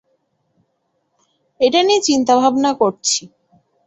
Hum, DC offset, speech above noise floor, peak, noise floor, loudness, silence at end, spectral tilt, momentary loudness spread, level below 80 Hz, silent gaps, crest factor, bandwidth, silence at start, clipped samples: none; under 0.1%; 54 dB; -2 dBFS; -68 dBFS; -15 LUFS; 0.6 s; -2.5 dB/octave; 5 LU; -62 dBFS; none; 16 dB; 8.4 kHz; 1.6 s; under 0.1%